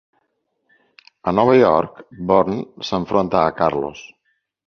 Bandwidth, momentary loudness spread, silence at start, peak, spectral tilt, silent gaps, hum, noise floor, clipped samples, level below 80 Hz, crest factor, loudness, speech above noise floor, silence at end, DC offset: 6.8 kHz; 16 LU; 1.25 s; -2 dBFS; -7 dB/octave; none; none; -71 dBFS; under 0.1%; -50 dBFS; 18 dB; -18 LUFS; 53 dB; 0.6 s; under 0.1%